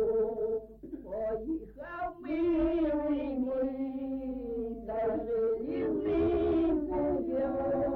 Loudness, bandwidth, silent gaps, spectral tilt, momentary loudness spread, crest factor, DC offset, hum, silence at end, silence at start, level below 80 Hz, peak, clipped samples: -32 LUFS; 4.5 kHz; none; -10 dB/octave; 10 LU; 12 dB; under 0.1%; none; 0 s; 0 s; -50 dBFS; -20 dBFS; under 0.1%